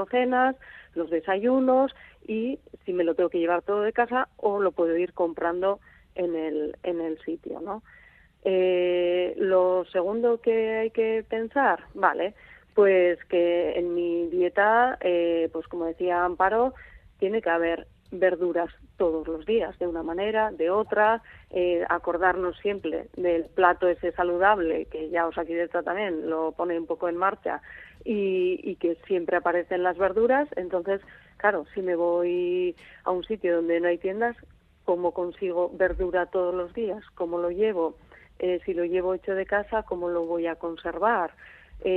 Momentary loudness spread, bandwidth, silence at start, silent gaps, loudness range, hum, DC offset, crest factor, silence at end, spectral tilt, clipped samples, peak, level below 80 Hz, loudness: 9 LU; 4.2 kHz; 0 s; none; 4 LU; none; under 0.1%; 20 dB; 0 s; -8 dB/octave; under 0.1%; -6 dBFS; -54 dBFS; -26 LUFS